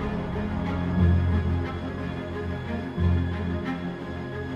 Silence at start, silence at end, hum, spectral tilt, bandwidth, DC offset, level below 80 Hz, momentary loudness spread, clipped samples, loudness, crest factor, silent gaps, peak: 0 s; 0 s; none; -9 dB/octave; 5.6 kHz; under 0.1%; -36 dBFS; 10 LU; under 0.1%; -28 LUFS; 16 dB; none; -10 dBFS